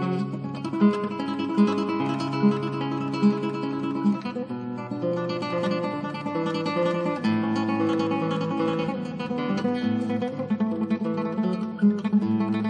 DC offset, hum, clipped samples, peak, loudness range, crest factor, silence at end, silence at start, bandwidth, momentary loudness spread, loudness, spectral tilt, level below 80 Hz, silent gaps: under 0.1%; none; under 0.1%; -8 dBFS; 3 LU; 16 dB; 0 s; 0 s; 9.4 kHz; 7 LU; -26 LUFS; -7.5 dB/octave; -68 dBFS; none